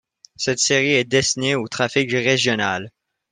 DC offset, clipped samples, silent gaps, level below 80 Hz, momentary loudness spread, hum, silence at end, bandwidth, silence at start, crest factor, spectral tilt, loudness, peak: under 0.1%; under 0.1%; none; -58 dBFS; 7 LU; none; 0.45 s; 10.5 kHz; 0.4 s; 18 dB; -3 dB/octave; -19 LUFS; -2 dBFS